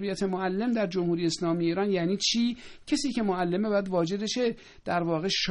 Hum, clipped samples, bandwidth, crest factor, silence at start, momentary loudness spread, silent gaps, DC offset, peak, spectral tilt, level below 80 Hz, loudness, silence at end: none; under 0.1%; 10.5 kHz; 14 dB; 0 s; 5 LU; none; under 0.1%; -14 dBFS; -4.5 dB/octave; -58 dBFS; -28 LUFS; 0 s